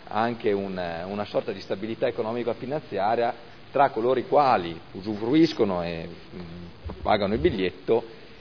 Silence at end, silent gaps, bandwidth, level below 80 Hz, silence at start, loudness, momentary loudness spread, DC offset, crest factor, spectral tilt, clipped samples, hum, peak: 0 s; none; 5.4 kHz; -50 dBFS; 0 s; -26 LUFS; 18 LU; 0.4%; 18 dB; -7.5 dB/octave; under 0.1%; none; -6 dBFS